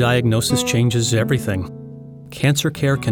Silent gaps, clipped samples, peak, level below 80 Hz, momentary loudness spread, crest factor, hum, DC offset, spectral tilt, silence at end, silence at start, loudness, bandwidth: none; under 0.1%; -4 dBFS; -46 dBFS; 19 LU; 14 dB; none; under 0.1%; -5 dB/octave; 0 s; 0 s; -18 LUFS; 18 kHz